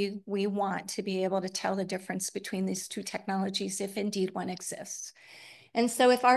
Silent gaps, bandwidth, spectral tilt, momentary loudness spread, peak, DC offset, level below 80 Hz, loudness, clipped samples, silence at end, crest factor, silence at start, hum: none; 12.5 kHz; -4 dB/octave; 8 LU; -10 dBFS; under 0.1%; -78 dBFS; -31 LUFS; under 0.1%; 0 s; 22 dB; 0 s; none